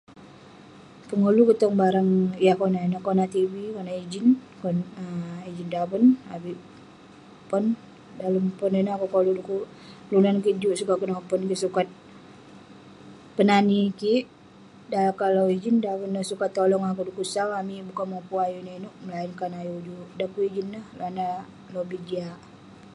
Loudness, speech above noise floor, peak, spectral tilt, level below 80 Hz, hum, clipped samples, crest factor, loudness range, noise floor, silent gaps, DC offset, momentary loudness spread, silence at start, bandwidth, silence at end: -25 LUFS; 25 dB; -6 dBFS; -7 dB/octave; -68 dBFS; none; under 0.1%; 20 dB; 9 LU; -49 dBFS; none; under 0.1%; 15 LU; 0.1 s; 11.5 kHz; 0.05 s